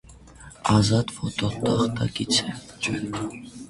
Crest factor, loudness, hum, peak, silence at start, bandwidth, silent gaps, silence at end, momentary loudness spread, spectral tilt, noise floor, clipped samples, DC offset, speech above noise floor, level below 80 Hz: 20 dB; -25 LUFS; none; -6 dBFS; 0.1 s; 11.5 kHz; none; 0 s; 11 LU; -5 dB/octave; -46 dBFS; under 0.1%; under 0.1%; 22 dB; -48 dBFS